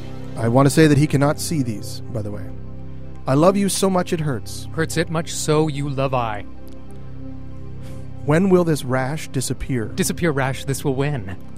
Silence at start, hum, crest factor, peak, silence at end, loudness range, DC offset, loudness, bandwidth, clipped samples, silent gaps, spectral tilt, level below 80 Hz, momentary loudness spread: 0 s; none; 20 dB; -2 dBFS; 0 s; 4 LU; 3%; -20 LUFS; 16 kHz; under 0.1%; none; -5.5 dB/octave; -42 dBFS; 20 LU